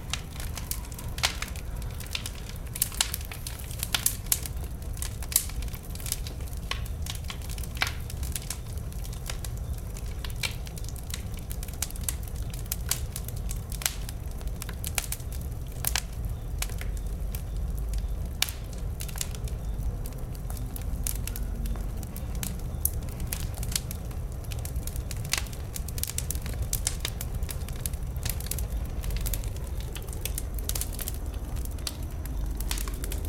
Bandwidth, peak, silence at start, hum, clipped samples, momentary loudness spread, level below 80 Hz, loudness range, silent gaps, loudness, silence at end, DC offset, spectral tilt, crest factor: 17 kHz; -2 dBFS; 0 s; none; under 0.1%; 8 LU; -34 dBFS; 4 LU; none; -33 LUFS; 0 s; under 0.1%; -3 dB/octave; 30 dB